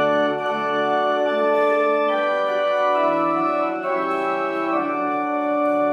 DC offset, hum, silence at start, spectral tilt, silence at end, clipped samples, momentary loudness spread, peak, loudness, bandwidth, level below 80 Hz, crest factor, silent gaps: under 0.1%; none; 0 s; -5.5 dB/octave; 0 s; under 0.1%; 4 LU; -8 dBFS; -21 LUFS; 8.2 kHz; -84 dBFS; 12 dB; none